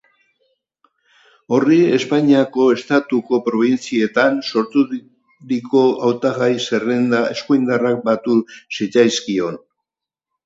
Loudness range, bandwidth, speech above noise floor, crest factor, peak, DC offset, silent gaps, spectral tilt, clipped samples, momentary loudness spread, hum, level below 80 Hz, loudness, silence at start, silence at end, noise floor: 2 LU; 7.8 kHz; 70 dB; 16 dB; 0 dBFS; under 0.1%; none; -5.5 dB/octave; under 0.1%; 8 LU; none; -66 dBFS; -17 LUFS; 1.5 s; 0.9 s; -86 dBFS